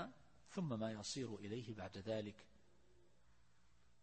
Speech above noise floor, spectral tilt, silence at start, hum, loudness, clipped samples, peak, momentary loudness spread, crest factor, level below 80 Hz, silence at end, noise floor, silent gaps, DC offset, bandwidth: 29 dB; -5 dB/octave; 0 s; none; -47 LUFS; under 0.1%; -32 dBFS; 9 LU; 18 dB; -76 dBFS; 1.55 s; -76 dBFS; none; under 0.1%; 8.4 kHz